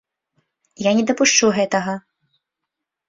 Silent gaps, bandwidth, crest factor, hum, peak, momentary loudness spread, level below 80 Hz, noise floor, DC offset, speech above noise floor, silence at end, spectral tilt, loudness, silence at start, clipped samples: none; 7.8 kHz; 20 dB; none; -2 dBFS; 12 LU; -62 dBFS; -82 dBFS; under 0.1%; 64 dB; 1.1 s; -3 dB/octave; -17 LUFS; 0.8 s; under 0.1%